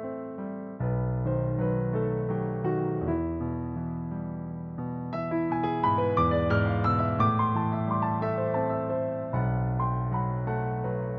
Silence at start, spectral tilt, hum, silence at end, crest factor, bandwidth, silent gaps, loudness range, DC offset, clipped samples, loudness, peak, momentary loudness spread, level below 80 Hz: 0 s; -8 dB/octave; none; 0 s; 16 dB; 5 kHz; none; 5 LU; under 0.1%; under 0.1%; -29 LUFS; -12 dBFS; 10 LU; -46 dBFS